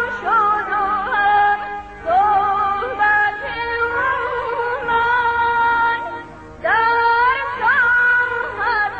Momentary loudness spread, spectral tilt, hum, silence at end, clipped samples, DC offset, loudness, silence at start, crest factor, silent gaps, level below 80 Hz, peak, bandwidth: 8 LU; -4.5 dB/octave; none; 0 s; under 0.1%; 0.2%; -17 LUFS; 0 s; 12 dB; none; -46 dBFS; -6 dBFS; 8.2 kHz